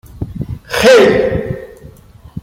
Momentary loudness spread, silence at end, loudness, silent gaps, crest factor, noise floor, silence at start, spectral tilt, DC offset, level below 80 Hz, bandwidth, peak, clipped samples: 20 LU; 0 s; -10 LUFS; none; 14 dB; -39 dBFS; 0.15 s; -5 dB/octave; under 0.1%; -36 dBFS; 16.5 kHz; 0 dBFS; under 0.1%